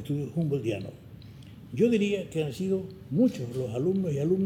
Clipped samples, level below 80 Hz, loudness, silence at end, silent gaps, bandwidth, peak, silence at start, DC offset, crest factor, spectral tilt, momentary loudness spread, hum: under 0.1%; -60 dBFS; -29 LUFS; 0 s; none; 16 kHz; -12 dBFS; 0 s; under 0.1%; 16 dB; -7.5 dB/octave; 22 LU; none